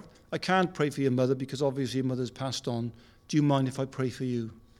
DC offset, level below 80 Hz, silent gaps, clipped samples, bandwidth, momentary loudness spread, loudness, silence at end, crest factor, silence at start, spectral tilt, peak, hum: under 0.1%; -62 dBFS; none; under 0.1%; 13.5 kHz; 8 LU; -30 LUFS; 0.2 s; 18 dB; 0 s; -6 dB/octave; -12 dBFS; none